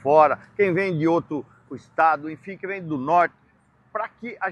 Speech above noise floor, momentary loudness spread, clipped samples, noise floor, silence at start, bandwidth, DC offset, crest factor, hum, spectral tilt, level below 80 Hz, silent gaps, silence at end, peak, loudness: 38 dB; 14 LU; under 0.1%; -60 dBFS; 0.05 s; 8.8 kHz; under 0.1%; 20 dB; none; -8 dB/octave; -66 dBFS; none; 0 s; -4 dBFS; -23 LUFS